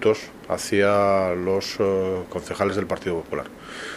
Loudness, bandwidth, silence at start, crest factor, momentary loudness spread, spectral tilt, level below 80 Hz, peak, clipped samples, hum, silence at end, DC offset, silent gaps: -23 LUFS; 14 kHz; 0 s; 18 dB; 12 LU; -5 dB/octave; -54 dBFS; -4 dBFS; under 0.1%; none; 0 s; under 0.1%; none